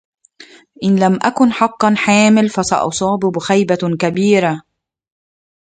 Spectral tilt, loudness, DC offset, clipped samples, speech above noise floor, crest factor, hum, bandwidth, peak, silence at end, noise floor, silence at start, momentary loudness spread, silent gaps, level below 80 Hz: -5 dB/octave; -14 LUFS; under 0.1%; under 0.1%; 29 dB; 16 dB; none; 9.4 kHz; 0 dBFS; 1.05 s; -43 dBFS; 0.4 s; 6 LU; none; -54 dBFS